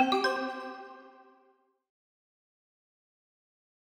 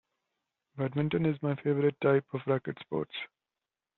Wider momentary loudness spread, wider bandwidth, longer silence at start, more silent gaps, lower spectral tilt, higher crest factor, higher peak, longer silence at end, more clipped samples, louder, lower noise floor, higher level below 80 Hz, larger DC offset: first, 22 LU vs 12 LU; first, 16.5 kHz vs 4.3 kHz; second, 0 s vs 0.75 s; neither; second, -2.5 dB/octave vs -6.5 dB/octave; about the same, 22 dB vs 20 dB; about the same, -14 dBFS vs -12 dBFS; first, 2.75 s vs 0.7 s; neither; about the same, -32 LUFS vs -31 LUFS; second, -68 dBFS vs under -90 dBFS; second, -82 dBFS vs -70 dBFS; neither